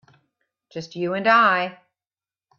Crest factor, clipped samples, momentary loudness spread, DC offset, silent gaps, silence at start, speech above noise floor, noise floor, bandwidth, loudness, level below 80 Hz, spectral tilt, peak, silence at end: 20 dB; under 0.1%; 20 LU; under 0.1%; none; 0.75 s; over 70 dB; under -90 dBFS; 7.2 kHz; -19 LUFS; -74 dBFS; -5.5 dB/octave; -4 dBFS; 0.85 s